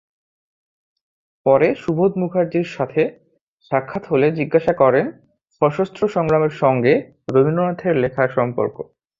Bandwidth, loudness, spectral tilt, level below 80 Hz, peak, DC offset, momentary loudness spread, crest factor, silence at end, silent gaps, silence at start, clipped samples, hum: 7.6 kHz; -19 LUFS; -8.5 dB/octave; -56 dBFS; -2 dBFS; under 0.1%; 7 LU; 18 dB; 0.35 s; 3.41-3.58 s; 1.45 s; under 0.1%; none